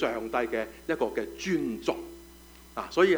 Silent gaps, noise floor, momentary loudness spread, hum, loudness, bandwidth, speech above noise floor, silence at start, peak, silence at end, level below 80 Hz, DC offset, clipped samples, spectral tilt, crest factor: none; -51 dBFS; 17 LU; none; -31 LUFS; over 20 kHz; 23 dB; 0 s; -10 dBFS; 0 s; -56 dBFS; under 0.1%; under 0.1%; -5 dB/octave; 20 dB